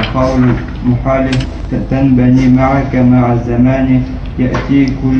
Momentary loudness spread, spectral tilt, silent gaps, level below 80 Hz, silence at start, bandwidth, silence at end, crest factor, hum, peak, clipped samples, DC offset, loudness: 8 LU; -8.5 dB/octave; none; -24 dBFS; 0 s; 8.2 kHz; 0 s; 10 dB; none; 0 dBFS; under 0.1%; under 0.1%; -11 LUFS